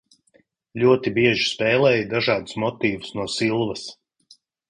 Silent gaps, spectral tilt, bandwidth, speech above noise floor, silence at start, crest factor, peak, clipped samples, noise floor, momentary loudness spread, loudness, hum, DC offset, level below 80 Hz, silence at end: none; -5 dB/octave; 10.5 kHz; 41 dB; 0.75 s; 18 dB; -4 dBFS; under 0.1%; -62 dBFS; 10 LU; -21 LUFS; none; under 0.1%; -58 dBFS; 0.75 s